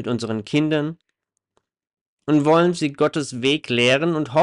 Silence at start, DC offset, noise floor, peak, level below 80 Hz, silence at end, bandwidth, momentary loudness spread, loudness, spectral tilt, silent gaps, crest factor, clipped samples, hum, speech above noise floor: 0 s; under 0.1%; -77 dBFS; -6 dBFS; -64 dBFS; 0 s; 11 kHz; 8 LU; -20 LUFS; -5.5 dB/octave; 2.01-2.17 s; 14 dB; under 0.1%; none; 58 dB